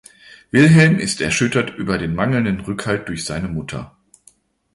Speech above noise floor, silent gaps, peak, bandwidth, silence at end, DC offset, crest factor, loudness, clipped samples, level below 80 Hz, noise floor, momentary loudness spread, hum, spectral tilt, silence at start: 37 dB; none; 0 dBFS; 11.5 kHz; 0.85 s; under 0.1%; 18 dB; -17 LUFS; under 0.1%; -44 dBFS; -54 dBFS; 14 LU; none; -5.5 dB/octave; 0.55 s